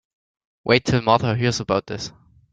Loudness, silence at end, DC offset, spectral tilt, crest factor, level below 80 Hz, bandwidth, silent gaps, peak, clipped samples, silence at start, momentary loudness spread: -20 LUFS; 0.45 s; under 0.1%; -5.5 dB/octave; 20 dB; -50 dBFS; 9.2 kHz; none; -2 dBFS; under 0.1%; 0.65 s; 14 LU